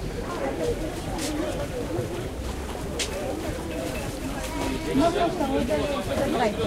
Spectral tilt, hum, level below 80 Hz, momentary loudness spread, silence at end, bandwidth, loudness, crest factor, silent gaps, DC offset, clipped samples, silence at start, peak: -5 dB/octave; none; -38 dBFS; 8 LU; 0 s; 16 kHz; -28 LUFS; 16 dB; none; under 0.1%; under 0.1%; 0 s; -10 dBFS